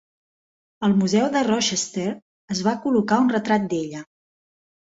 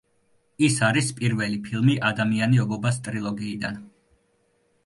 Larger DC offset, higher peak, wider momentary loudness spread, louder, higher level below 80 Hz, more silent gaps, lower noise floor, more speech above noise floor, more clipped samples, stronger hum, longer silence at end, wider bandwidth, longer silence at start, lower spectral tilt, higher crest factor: neither; about the same, -4 dBFS vs -6 dBFS; about the same, 11 LU vs 9 LU; about the same, -22 LUFS vs -24 LUFS; about the same, -64 dBFS vs -60 dBFS; first, 2.22-2.48 s vs none; first, under -90 dBFS vs -67 dBFS; first, over 69 dB vs 44 dB; neither; neither; second, 0.85 s vs 1 s; second, 8 kHz vs 11.5 kHz; first, 0.8 s vs 0.6 s; about the same, -4.5 dB/octave vs -5.5 dB/octave; about the same, 18 dB vs 18 dB